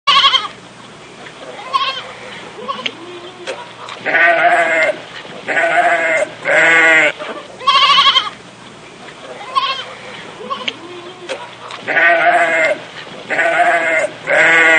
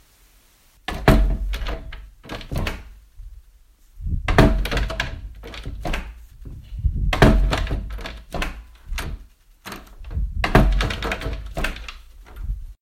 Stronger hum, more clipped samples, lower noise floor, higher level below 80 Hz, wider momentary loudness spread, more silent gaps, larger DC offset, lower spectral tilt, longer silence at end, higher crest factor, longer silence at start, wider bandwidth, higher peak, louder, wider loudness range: neither; neither; second, -36 dBFS vs -55 dBFS; second, -62 dBFS vs -26 dBFS; about the same, 22 LU vs 21 LU; neither; neither; second, -1.5 dB/octave vs -6 dB/octave; about the same, 0 s vs 0.1 s; second, 16 dB vs 22 dB; second, 0.05 s vs 0.9 s; second, 9.8 kHz vs 15 kHz; about the same, 0 dBFS vs 0 dBFS; first, -12 LUFS vs -23 LUFS; first, 12 LU vs 2 LU